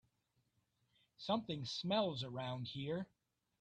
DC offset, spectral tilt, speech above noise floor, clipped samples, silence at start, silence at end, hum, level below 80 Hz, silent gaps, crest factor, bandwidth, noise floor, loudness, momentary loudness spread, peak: under 0.1%; -6 dB/octave; 42 dB; under 0.1%; 1.2 s; 0.55 s; none; -76 dBFS; none; 18 dB; 9.8 kHz; -82 dBFS; -41 LUFS; 8 LU; -26 dBFS